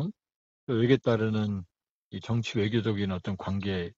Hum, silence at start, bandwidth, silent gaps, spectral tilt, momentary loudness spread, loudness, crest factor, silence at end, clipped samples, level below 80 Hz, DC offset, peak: none; 0 s; 7.8 kHz; 0.35-0.67 s, 1.89-2.11 s; -7.5 dB/octave; 13 LU; -29 LUFS; 20 dB; 0.05 s; under 0.1%; -60 dBFS; under 0.1%; -8 dBFS